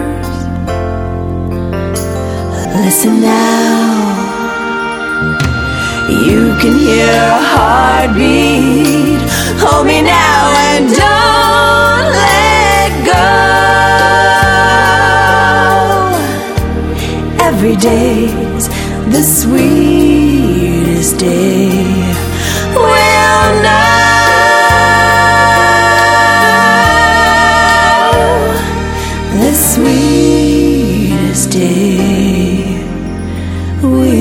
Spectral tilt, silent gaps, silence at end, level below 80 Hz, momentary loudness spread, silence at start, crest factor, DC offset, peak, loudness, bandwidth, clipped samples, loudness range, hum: -4.5 dB/octave; none; 0 s; -24 dBFS; 10 LU; 0 s; 8 dB; under 0.1%; 0 dBFS; -9 LUFS; 19 kHz; 0.5%; 5 LU; none